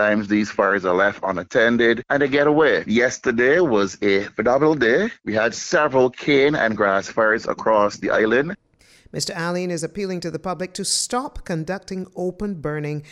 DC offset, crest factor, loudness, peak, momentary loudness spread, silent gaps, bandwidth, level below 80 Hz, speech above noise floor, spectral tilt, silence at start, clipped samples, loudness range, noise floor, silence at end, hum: under 0.1%; 16 dB; -20 LUFS; -4 dBFS; 11 LU; none; 14 kHz; -50 dBFS; 33 dB; -4.5 dB/octave; 0 s; under 0.1%; 7 LU; -53 dBFS; 0.1 s; none